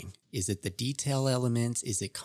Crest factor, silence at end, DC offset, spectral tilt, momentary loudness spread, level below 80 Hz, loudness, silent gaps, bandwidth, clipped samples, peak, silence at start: 18 dB; 0 s; under 0.1%; -4.5 dB/octave; 5 LU; -66 dBFS; -31 LUFS; none; 14.5 kHz; under 0.1%; -14 dBFS; 0 s